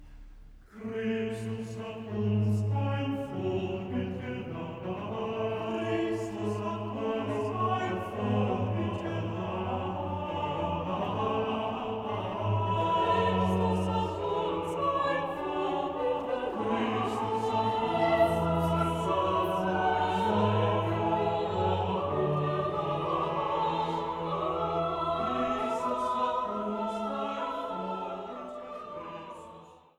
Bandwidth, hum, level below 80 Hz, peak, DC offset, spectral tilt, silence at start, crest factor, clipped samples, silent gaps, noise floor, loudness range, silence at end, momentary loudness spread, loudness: 13.5 kHz; none; -56 dBFS; -14 dBFS; under 0.1%; -7 dB/octave; 0 s; 16 dB; under 0.1%; none; -51 dBFS; 5 LU; 0.2 s; 9 LU; -31 LUFS